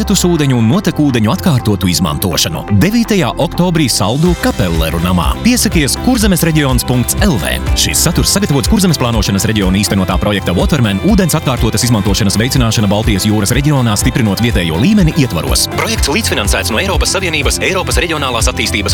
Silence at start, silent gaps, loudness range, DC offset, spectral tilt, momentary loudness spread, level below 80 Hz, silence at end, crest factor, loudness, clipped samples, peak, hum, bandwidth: 0 s; none; 1 LU; under 0.1%; -4.5 dB/octave; 3 LU; -22 dBFS; 0 s; 12 dB; -12 LUFS; under 0.1%; 0 dBFS; none; 19 kHz